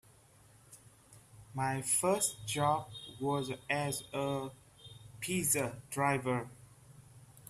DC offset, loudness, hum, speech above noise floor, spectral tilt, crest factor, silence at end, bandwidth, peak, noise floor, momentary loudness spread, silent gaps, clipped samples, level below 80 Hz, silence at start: under 0.1%; -34 LUFS; none; 28 dB; -3.5 dB/octave; 20 dB; 0 s; 15.5 kHz; -16 dBFS; -62 dBFS; 17 LU; none; under 0.1%; -68 dBFS; 0.7 s